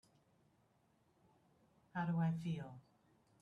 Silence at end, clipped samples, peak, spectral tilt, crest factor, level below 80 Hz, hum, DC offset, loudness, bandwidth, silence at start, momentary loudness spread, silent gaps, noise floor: 0.6 s; under 0.1%; -28 dBFS; -8.5 dB/octave; 18 dB; -80 dBFS; none; under 0.1%; -42 LUFS; 6.4 kHz; 1.95 s; 16 LU; none; -76 dBFS